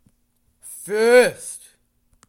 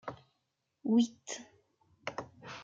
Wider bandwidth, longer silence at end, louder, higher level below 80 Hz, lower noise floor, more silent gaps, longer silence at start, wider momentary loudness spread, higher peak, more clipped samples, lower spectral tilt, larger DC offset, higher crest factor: first, 16.5 kHz vs 7.8 kHz; first, 0.7 s vs 0 s; first, -17 LUFS vs -35 LUFS; first, -66 dBFS vs -76 dBFS; second, -65 dBFS vs -82 dBFS; neither; first, 0.65 s vs 0.05 s; first, 24 LU vs 17 LU; first, -2 dBFS vs -18 dBFS; neither; second, -2.5 dB/octave vs -4.5 dB/octave; neither; about the same, 18 dB vs 20 dB